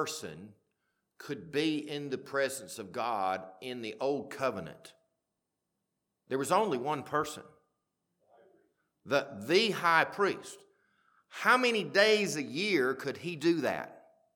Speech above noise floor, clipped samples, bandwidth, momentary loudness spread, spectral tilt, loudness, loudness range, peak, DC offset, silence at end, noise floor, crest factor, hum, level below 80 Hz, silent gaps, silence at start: 54 dB; under 0.1%; 19 kHz; 17 LU; -4 dB/octave; -31 LUFS; 8 LU; -10 dBFS; under 0.1%; 0.35 s; -85 dBFS; 24 dB; none; -78 dBFS; none; 0 s